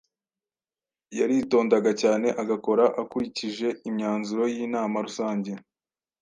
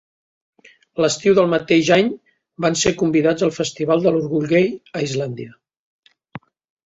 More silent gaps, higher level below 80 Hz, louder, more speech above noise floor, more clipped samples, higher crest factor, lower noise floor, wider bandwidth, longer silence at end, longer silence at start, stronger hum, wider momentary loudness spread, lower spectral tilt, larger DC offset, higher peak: second, none vs 5.79-6.03 s; second, -70 dBFS vs -56 dBFS; second, -25 LUFS vs -18 LUFS; first, over 65 dB vs 23 dB; neither; about the same, 18 dB vs 18 dB; first, under -90 dBFS vs -40 dBFS; first, 9.8 kHz vs 8.2 kHz; first, 0.65 s vs 0.45 s; first, 1.1 s vs 0.95 s; neither; second, 8 LU vs 11 LU; about the same, -5.5 dB/octave vs -5 dB/octave; neither; second, -8 dBFS vs -2 dBFS